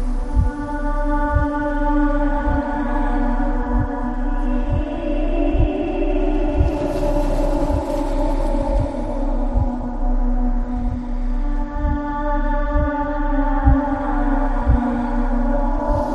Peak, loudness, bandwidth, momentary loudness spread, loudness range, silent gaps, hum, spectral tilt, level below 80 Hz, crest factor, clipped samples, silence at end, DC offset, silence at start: -2 dBFS; -22 LUFS; 5.6 kHz; 5 LU; 3 LU; none; none; -8.5 dB/octave; -20 dBFS; 16 dB; under 0.1%; 0 s; under 0.1%; 0 s